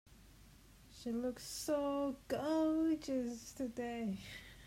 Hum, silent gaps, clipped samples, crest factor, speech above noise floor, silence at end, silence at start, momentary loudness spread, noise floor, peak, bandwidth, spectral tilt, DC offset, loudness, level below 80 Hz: none; none; under 0.1%; 14 dB; 23 dB; 0 s; 0.1 s; 11 LU; -61 dBFS; -26 dBFS; 16 kHz; -5 dB/octave; under 0.1%; -39 LUFS; -64 dBFS